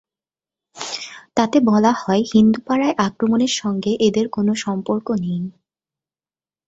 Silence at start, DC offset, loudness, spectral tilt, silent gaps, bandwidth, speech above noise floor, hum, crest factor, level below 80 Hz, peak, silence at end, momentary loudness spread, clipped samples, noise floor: 0.75 s; under 0.1%; -19 LUFS; -5.5 dB/octave; none; 8 kHz; over 73 dB; none; 18 dB; -58 dBFS; -2 dBFS; 1.2 s; 12 LU; under 0.1%; under -90 dBFS